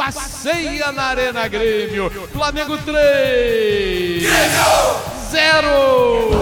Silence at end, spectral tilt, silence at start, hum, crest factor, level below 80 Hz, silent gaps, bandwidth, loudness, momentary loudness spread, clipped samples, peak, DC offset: 0 s; -3 dB/octave; 0 s; none; 16 dB; -34 dBFS; none; 17.5 kHz; -16 LUFS; 9 LU; under 0.1%; 0 dBFS; under 0.1%